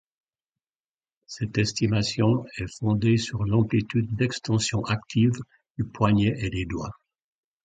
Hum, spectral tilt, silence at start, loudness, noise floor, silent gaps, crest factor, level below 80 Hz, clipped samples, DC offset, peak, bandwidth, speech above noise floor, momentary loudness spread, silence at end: none; -6 dB/octave; 1.3 s; -25 LUFS; under -90 dBFS; 5.70-5.75 s; 20 dB; -48 dBFS; under 0.1%; under 0.1%; -6 dBFS; 9.2 kHz; over 66 dB; 11 LU; 0.75 s